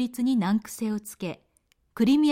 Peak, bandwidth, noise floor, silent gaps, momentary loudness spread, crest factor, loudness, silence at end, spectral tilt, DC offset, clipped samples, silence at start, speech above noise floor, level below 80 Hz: -12 dBFS; 16.5 kHz; -68 dBFS; none; 16 LU; 14 dB; -27 LUFS; 0 s; -5.5 dB/octave; under 0.1%; under 0.1%; 0 s; 44 dB; -64 dBFS